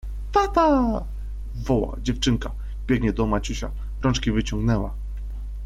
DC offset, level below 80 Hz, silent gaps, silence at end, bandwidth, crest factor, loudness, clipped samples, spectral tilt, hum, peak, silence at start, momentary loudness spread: under 0.1%; -30 dBFS; none; 0 s; 12 kHz; 16 dB; -24 LUFS; under 0.1%; -6 dB/octave; 50 Hz at -30 dBFS; -8 dBFS; 0.05 s; 15 LU